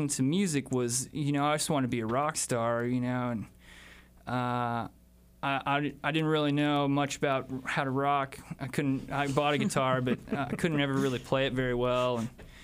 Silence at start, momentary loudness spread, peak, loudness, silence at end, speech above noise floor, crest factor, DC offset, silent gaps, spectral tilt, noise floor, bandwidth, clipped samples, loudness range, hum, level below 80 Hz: 0 s; 8 LU; -12 dBFS; -30 LUFS; 0 s; 24 dB; 18 dB; under 0.1%; none; -5 dB/octave; -53 dBFS; 15.5 kHz; under 0.1%; 4 LU; none; -56 dBFS